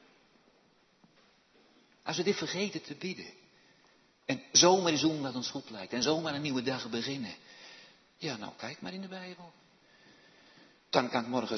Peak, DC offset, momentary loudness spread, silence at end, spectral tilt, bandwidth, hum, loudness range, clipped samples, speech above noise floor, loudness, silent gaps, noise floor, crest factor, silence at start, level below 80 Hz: -10 dBFS; under 0.1%; 21 LU; 0 s; -3 dB/octave; 6.4 kHz; none; 13 LU; under 0.1%; 35 dB; -31 LUFS; none; -67 dBFS; 26 dB; 2.05 s; -78 dBFS